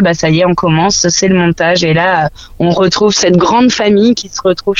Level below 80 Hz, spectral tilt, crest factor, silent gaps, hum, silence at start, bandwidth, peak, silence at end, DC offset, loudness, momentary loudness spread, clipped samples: -38 dBFS; -4.5 dB/octave; 10 dB; none; none; 0 s; 7.8 kHz; 0 dBFS; 0 s; under 0.1%; -10 LUFS; 5 LU; under 0.1%